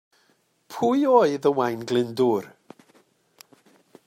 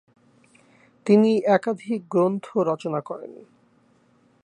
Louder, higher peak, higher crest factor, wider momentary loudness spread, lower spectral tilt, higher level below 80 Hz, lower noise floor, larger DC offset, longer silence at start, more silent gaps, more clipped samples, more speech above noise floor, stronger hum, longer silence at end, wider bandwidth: about the same, -22 LUFS vs -22 LUFS; about the same, -4 dBFS vs -6 dBFS; about the same, 20 dB vs 20 dB; second, 10 LU vs 17 LU; second, -6 dB/octave vs -7.5 dB/octave; about the same, -74 dBFS vs -76 dBFS; first, -66 dBFS vs -61 dBFS; neither; second, 0.7 s vs 1.05 s; neither; neither; first, 44 dB vs 39 dB; neither; first, 1.6 s vs 1.05 s; first, 16 kHz vs 9.8 kHz